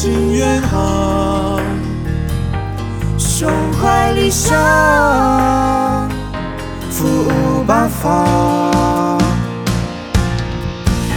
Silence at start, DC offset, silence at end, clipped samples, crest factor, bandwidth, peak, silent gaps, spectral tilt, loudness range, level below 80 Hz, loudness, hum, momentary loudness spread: 0 s; under 0.1%; 0 s; under 0.1%; 14 dB; over 20 kHz; 0 dBFS; none; -5.5 dB/octave; 4 LU; -26 dBFS; -15 LUFS; none; 9 LU